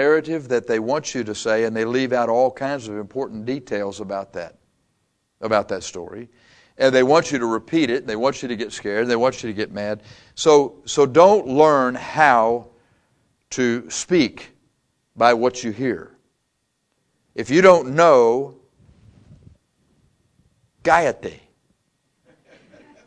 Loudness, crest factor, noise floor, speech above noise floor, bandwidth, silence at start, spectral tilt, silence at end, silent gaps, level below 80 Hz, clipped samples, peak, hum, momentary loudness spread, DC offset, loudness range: -19 LUFS; 20 dB; -72 dBFS; 53 dB; 9.8 kHz; 0 s; -4.5 dB/octave; 1.7 s; none; -58 dBFS; under 0.1%; 0 dBFS; none; 17 LU; under 0.1%; 9 LU